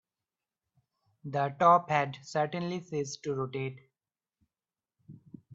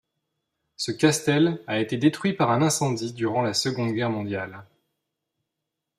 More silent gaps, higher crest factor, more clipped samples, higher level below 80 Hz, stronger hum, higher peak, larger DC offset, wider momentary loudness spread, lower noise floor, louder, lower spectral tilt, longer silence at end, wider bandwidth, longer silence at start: neither; about the same, 22 dB vs 20 dB; neither; second, -76 dBFS vs -66 dBFS; neither; second, -10 dBFS vs -6 dBFS; neither; first, 14 LU vs 10 LU; first, under -90 dBFS vs -83 dBFS; second, -30 LUFS vs -24 LUFS; about the same, -5.5 dB/octave vs -5 dB/octave; second, 0 s vs 1.35 s; second, 8 kHz vs 15 kHz; first, 1.25 s vs 0.8 s